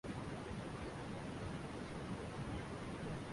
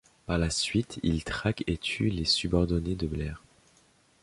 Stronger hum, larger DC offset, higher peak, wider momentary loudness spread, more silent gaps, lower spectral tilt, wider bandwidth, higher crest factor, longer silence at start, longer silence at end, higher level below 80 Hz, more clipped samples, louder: neither; neither; second, -32 dBFS vs -10 dBFS; second, 1 LU vs 8 LU; neither; about the same, -6 dB/octave vs -5 dB/octave; about the same, 11.5 kHz vs 11.5 kHz; second, 14 dB vs 20 dB; second, 0.05 s vs 0.3 s; second, 0 s vs 0.85 s; second, -58 dBFS vs -42 dBFS; neither; second, -46 LUFS vs -29 LUFS